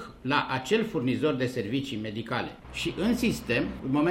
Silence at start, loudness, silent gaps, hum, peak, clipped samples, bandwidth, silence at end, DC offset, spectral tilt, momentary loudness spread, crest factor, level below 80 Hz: 0 s; -29 LUFS; none; none; -10 dBFS; under 0.1%; 16 kHz; 0 s; under 0.1%; -5.5 dB/octave; 6 LU; 18 dB; -50 dBFS